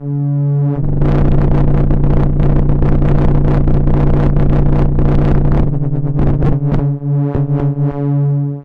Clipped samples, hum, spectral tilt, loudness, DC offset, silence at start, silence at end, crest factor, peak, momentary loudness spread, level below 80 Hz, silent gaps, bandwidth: under 0.1%; none; -11.5 dB/octave; -14 LUFS; under 0.1%; 0 s; 0 s; 10 dB; 0 dBFS; 3 LU; -16 dBFS; none; 3.8 kHz